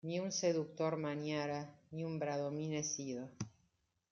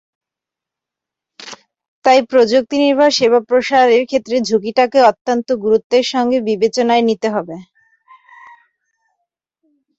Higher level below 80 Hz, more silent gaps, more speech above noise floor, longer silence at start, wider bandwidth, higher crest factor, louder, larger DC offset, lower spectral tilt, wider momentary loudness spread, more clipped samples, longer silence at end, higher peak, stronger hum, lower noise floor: second, -80 dBFS vs -60 dBFS; second, none vs 1.88-2.02 s, 5.21-5.25 s, 5.84-5.90 s; second, 41 dB vs 72 dB; second, 0.05 s vs 1.4 s; about the same, 7.6 kHz vs 8 kHz; about the same, 18 dB vs 14 dB; second, -40 LUFS vs -14 LUFS; neither; about the same, -4.5 dB/octave vs -4 dB/octave; about the same, 11 LU vs 11 LU; neither; second, 0.65 s vs 2.35 s; second, -22 dBFS vs -2 dBFS; neither; second, -80 dBFS vs -85 dBFS